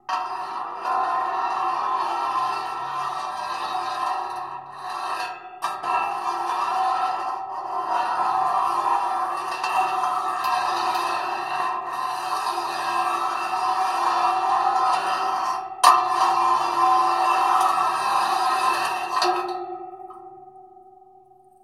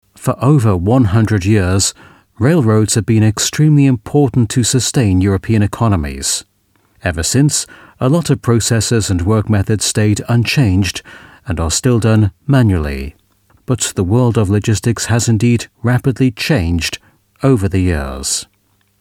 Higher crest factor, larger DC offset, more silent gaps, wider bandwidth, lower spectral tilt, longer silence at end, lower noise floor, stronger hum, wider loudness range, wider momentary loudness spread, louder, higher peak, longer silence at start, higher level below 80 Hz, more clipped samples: first, 22 dB vs 14 dB; neither; neither; about the same, 16.5 kHz vs 16 kHz; second, -1.5 dB/octave vs -5.5 dB/octave; first, 0.8 s vs 0.55 s; second, -52 dBFS vs -58 dBFS; neither; first, 7 LU vs 3 LU; first, 10 LU vs 7 LU; second, -23 LUFS vs -14 LUFS; about the same, -2 dBFS vs 0 dBFS; about the same, 0.1 s vs 0.2 s; second, -74 dBFS vs -32 dBFS; neither